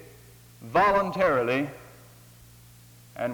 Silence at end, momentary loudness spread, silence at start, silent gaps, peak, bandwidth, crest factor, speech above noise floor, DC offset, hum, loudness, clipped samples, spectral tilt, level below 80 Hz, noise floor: 0 s; 25 LU; 0 s; none; -10 dBFS; over 20 kHz; 18 dB; 28 dB; under 0.1%; none; -25 LUFS; under 0.1%; -6 dB/octave; -56 dBFS; -52 dBFS